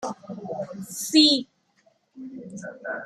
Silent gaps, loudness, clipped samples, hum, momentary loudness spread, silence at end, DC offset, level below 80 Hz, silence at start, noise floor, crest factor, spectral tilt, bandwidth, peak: none; -22 LUFS; under 0.1%; none; 24 LU; 0 s; under 0.1%; -74 dBFS; 0 s; -65 dBFS; 22 dB; -2.5 dB/octave; 14.5 kHz; -4 dBFS